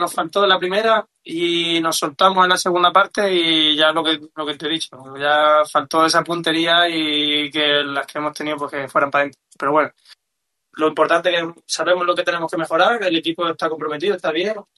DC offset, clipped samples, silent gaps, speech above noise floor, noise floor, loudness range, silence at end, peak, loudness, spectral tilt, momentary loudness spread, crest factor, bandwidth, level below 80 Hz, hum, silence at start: under 0.1%; under 0.1%; none; 59 dB; -77 dBFS; 4 LU; 0.15 s; -2 dBFS; -17 LUFS; -3 dB/octave; 10 LU; 18 dB; 12.5 kHz; -68 dBFS; none; 0 s